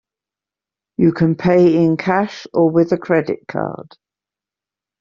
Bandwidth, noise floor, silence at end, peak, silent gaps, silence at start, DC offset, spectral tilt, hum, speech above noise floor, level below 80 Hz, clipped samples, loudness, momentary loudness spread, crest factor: 7 kHz; -88 dBFS; 1.2 s; -2 dBFS; none; 1 s; under 0.1%; -7 dB/octave; 50 Hz at -50 dBFS; 73 dB; -54 dBFS; under 0.1%; -16 LUFS; 11 LU; 16 dB